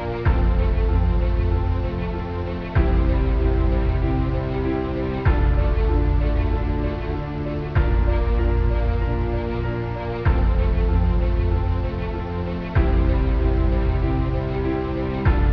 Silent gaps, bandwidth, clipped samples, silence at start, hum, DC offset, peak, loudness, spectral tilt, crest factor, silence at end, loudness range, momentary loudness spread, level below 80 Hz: none; 5.4 kHz; under 0.1%; 0 s; none; 0.4%; -6 dBFS; -22 LUFS; -10 dB/octave; 14 dB; 0 s; 1 LU; 6 LU; -22 dBFS